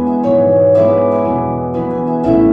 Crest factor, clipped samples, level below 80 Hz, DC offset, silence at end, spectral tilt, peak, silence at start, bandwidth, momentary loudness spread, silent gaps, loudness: 10 dB; under 0.1%; -40 dBFS; under 0.1%; 0 s; -10.5 dB/octave; -2 dBFS; 0 s; 5 kHz; 8 LU; none; -13 LUFS